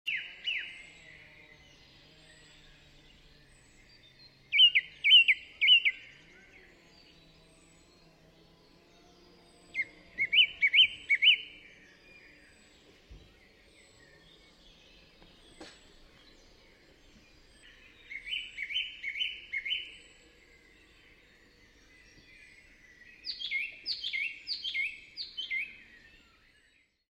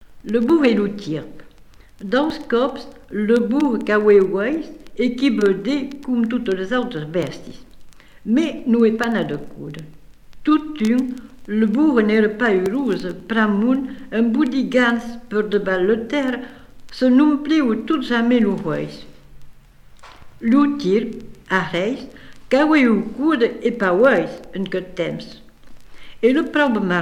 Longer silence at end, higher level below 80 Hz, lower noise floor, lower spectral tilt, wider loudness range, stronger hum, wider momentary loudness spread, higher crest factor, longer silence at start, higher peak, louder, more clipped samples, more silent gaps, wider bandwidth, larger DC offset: first, 1.35 s vs 0 s; second, -66 dBFS vs -48 dBFS; first, -68 dBFS vs -45 dBFS; second, 0 dB/octave vs -6.5 dB/octave; first, 18 LU vs 4 LU; neither; first, 21 LU vs 14 LU; first, 24 dB vs 16 dB; about the same, 0.05 s vs 0 s; second, -10 dBFS vs -2 dBFS; second, -26 LUFS vs -19 LUFS; neither; neither; about the same, 12 kHz vs 11 kHz; neither